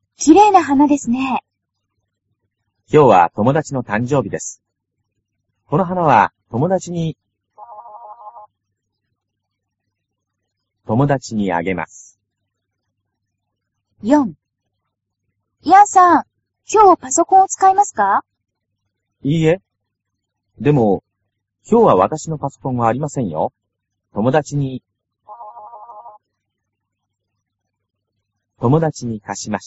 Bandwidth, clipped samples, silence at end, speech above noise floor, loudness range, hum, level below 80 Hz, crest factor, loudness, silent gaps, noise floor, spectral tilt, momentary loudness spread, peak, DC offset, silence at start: 8 kHz; under 0.1%; 0 s; 62 dB; 11 LU; none; -54 dBFS; 18 dB; -15 LUFS; none; -76 dBFS; -6.5 dB/octave; 15 LU; 0 dBFS; under 0.1%; 0.2 s